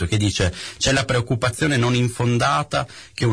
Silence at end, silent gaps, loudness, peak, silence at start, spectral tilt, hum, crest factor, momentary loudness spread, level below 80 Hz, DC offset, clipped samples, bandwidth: 0 s; none; -20 LUFS; -8 dBFS; 0 s; -4.5 dB/octave; none; 12 dB; 6 LU; -40 dBFS; 0.1%; under 0.1%; 11 kHz